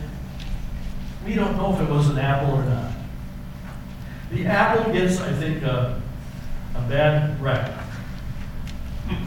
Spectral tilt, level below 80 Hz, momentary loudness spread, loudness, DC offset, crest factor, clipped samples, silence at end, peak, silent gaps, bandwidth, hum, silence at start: -7 dB/octave; -34 dBFS; 16 LU; -24 LUFS; under 0.1%; 18 dB; under 0.1%; 0 s; -6 dBFS; none; 16.5 kHz; none; 0 s